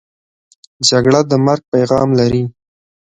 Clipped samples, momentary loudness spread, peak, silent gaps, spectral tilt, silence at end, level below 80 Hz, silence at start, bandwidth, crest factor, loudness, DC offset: under 0.1%; 4 LU; 0 dBFS; 1.68-1.72 s; -5 dB/octave; 0.65 s; -46 dBFS; 0.8 s; 9.6 kHz; 14 dB; -13 LUFS; under 0.1%